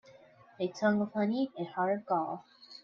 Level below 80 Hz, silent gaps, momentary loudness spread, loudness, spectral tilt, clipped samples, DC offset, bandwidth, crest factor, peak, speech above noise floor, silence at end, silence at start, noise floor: -78 dBFS; none; 10 LU; -33 LUFS; -7 dB/octave; under 0.1%; under 0.1%; 7 kHz; 18 dB; -16 dBFS; 27 dB; 0.05 s; 0.1 s; -58 dBFS